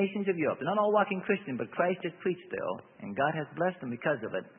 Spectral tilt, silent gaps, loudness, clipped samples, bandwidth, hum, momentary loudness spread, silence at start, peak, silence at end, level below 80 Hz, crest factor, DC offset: -10 dB/octave; none; -31 LUFS; under 0.1%; 3.7 kHz; none; 9 LU; 0 s; -12 dBFS; 0.1 s; -76 dBFS; 18 dB; under 0.1%